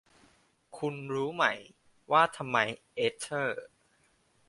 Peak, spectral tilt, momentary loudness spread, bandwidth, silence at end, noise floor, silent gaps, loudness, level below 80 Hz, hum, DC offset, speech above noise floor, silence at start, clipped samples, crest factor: -10 dBFS; -4 dB/octave; 11 LU; 11.5 kHz; 0.85 s; -69 dBFS; none; -30 LUFS; -74 dBFS; none; under 0.1%; 39 dB; 0.75 s; under 0.1%; 24 dB